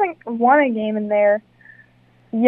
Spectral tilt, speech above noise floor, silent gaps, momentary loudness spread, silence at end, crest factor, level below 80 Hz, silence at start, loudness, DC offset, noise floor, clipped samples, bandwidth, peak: -9.5 dB/octave; 37 dB; none; 8 LU; 0 s; 18 dB; -68 dBFS; 0 s; -18 LUFS; under 0.1%; -54 dBFS; under 0.1%; 3.7 kHz; -2 dBFS